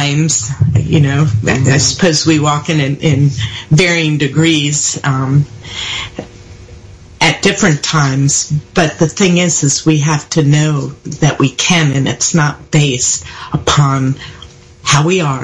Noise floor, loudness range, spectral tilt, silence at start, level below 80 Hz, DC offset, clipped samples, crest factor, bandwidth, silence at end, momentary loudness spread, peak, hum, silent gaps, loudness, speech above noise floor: -35 dBFS; 3 LU; -4.5 dB/octave; 0 s; -40 dBFS; under 0.1%; under 0.1%; 12 dB; 11 kHz; 0 s; 8 LU; 0 dBFS; none; none; -12 LUFS; 23 dB